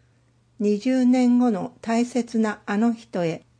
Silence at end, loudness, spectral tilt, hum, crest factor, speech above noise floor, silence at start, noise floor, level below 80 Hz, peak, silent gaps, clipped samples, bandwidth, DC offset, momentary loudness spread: 0.2 s; -22 LUFS; -6.5 dB/octave; none; 10 dB; 39 dB; 0.6 s; -61 dBFS; -68 dBFS; -12 dBFS; none; under 0.1%; 9.4 kHz; under 0.1%; 9 LU